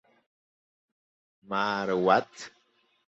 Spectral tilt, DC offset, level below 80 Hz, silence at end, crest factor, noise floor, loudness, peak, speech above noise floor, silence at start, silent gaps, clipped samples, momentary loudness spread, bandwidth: -5 dB/octave; under 0.1%; -72 dBFS; 0.6 s; 24 dB; -70 dBFS; -27 LUFS; -8 dBFS; 43 dB; 1.5 s; none; under 0.1%; 21 LU; 8.2 kHz